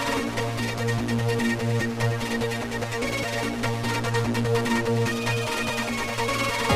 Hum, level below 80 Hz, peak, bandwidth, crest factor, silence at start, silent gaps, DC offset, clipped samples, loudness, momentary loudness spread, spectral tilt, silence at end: none; -48 dBFS; -10 dBFS; 16 kHz; 16 dB; 0 s; none; under 0.1%; under 0.1%; -26 LUFS; 3 LU; -5 dB/octave; 0 s